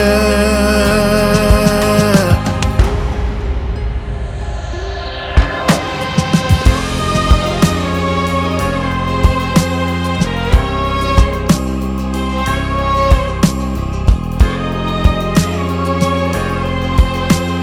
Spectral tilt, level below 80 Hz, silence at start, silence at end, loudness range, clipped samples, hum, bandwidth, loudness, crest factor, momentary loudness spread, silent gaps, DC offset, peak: -5.5 dB/octave; -18 dBFS; 0 s; 0 s; 4 LU; under 0.1%; none; 16 kHz; -15 LUFS; 14 dB; 8 LU; none; under 0.1%; 0 dBFS